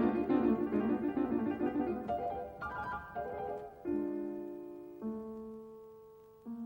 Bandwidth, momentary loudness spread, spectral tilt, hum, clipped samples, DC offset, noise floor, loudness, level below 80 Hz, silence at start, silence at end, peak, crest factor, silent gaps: 16.5 kHz; 17 LU; -9 dB/octave; none; under 0.1%; under 0.1%; -57 dBFS; -37 LUFS; -62 dBFS; 0 s; 0 s; -18 dBFS; 18 dB; none